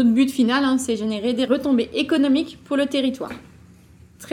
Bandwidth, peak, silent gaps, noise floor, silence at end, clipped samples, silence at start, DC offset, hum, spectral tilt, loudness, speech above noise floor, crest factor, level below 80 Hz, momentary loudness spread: 15 kHz; -6 dBFS; none; -48 dBFS; 0 s; under 0.1%; 0 s; under 0.1%; none; -4.5 dB/octave; -20 LUFS; 29 dB; 14 dB; -56 dBFS; 7 LU